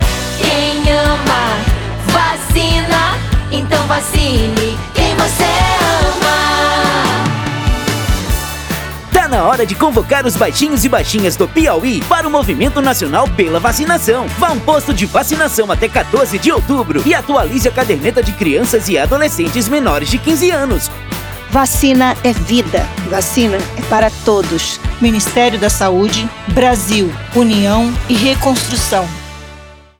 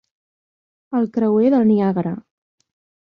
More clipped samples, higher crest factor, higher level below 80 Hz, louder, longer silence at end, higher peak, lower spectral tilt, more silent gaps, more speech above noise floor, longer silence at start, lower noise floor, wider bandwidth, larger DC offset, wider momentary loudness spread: neither; about the same, 12 dB vs 14 dB; first, -24 dBFS vs -64 dBFS; first, -13 LUFS vs -18 LUFS; second, 0.25 s vs 0.9 s; first, 0 dBFS vs -6 dBFS; second, -4 dB/octave vs -10.5 dB/octave; neither; second, 23 dB vs over 73 dB; second, 0 s vs 0.9 s; second, -36 dBFS vs under -90 dBFS; first, over 20 kHz vs 5 kHz; neither; second, 5 LU vs 11 LU